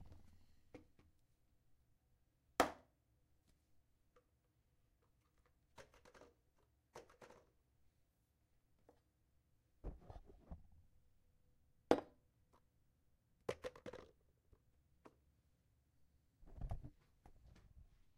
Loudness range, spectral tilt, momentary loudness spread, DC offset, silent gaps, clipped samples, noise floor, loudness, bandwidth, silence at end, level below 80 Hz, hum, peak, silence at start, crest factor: 19 LU; -5 dB/octave; 26 LU; under 0.1%; none; under 0.1%; -81 dBFS; -45 LUFS; 13 kHz; 0.35 s; -66 dBFS; none; -14 dBFS; 0 s; 40 dB